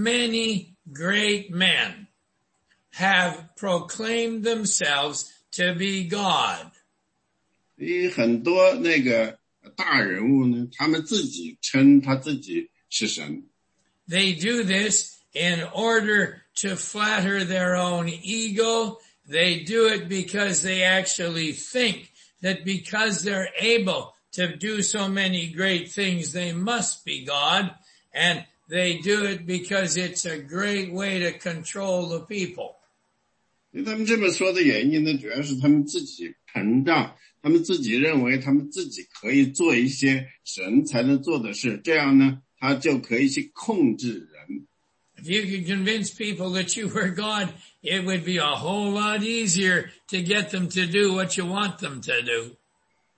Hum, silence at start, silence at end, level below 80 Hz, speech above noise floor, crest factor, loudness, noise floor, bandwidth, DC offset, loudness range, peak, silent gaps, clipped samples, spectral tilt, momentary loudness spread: none; 0 s; 0.65 s; -68 dBFS; 50 dB; 18 dB; -23 LUFS; -74 dBFS; 8.8 kHz; under 0.1%; 4 LU; -6 dBFS; none; under 0.1%; -3.5 dB/octave; 11 LU